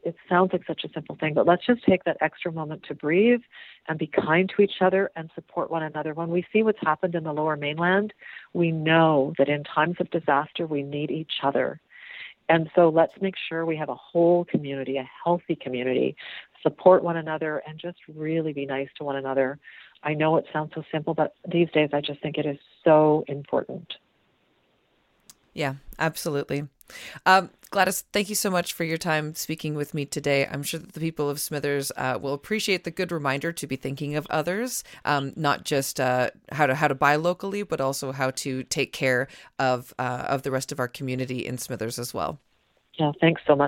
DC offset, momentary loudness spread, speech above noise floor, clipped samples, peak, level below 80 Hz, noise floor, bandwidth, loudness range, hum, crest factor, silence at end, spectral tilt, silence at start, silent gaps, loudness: under 0.1%; 11 LU; 42 dB; under 0.1%; -4 dBFS; -62 dBFS; -67 dBFS; 17 kHz; 4 LU; none; 22 dB; 0 s; -5 dB/octave; 0.05 s; none; -25 LUFS